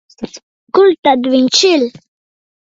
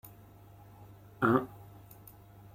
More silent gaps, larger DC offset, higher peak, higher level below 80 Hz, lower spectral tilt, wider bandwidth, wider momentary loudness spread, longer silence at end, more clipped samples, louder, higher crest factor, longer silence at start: first, 0.43-0.67 s, 0.98-1.03 s vs none; neither; first, 0 dBFS vs -12 dBFS; first, -58 dBFS vs -64 dBFS; second, -2.5 dB/octave vs -8 dB/octave; second, 7.8 kHz vs 16.5 kHz; second, 19 LU vs 27 LU; second, 0.8 s vs 1 s; neither; first, -11 LUFS vs -30 LUFS; second, 14 dB vs 26 dB; second, 0.2 s vs 0.8 s